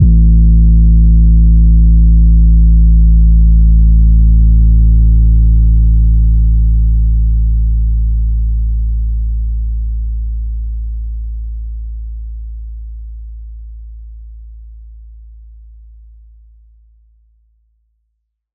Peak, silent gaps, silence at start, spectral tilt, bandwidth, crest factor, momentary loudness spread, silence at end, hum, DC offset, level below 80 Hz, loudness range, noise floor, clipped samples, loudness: 0 dBFS; none; 0 s; -17 dB/octave; 0.5 kHz; 10 dB; 19 LU; 3.6 s; none; under 0.1%; -10 dBFS; 20 LU; -69 dBFS; under 0.1%; -11 LUFS